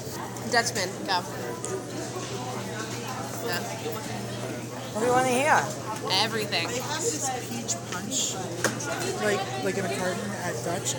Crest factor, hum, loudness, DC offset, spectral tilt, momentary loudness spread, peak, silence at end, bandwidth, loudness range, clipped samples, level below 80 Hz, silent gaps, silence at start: 22 dB; none; -28 LUFS; under 0.1%; -3 dB/octave; 9 LU; -8 dBFS; 0 s; over 20 kHz; 7 LU; under 0.1%; -62 dBFS; none; 0 s